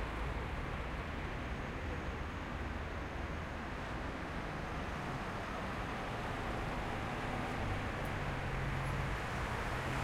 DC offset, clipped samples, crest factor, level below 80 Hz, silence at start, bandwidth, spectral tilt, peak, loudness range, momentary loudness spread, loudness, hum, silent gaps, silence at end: under 0.1%; under 0.1%; 16 dB; -46 dBFS; 0 s; 16 kHz; -6 dB/octave; -24 dBFS; 3 LU; 4 LU; -40 LUFS; none; none; 0 s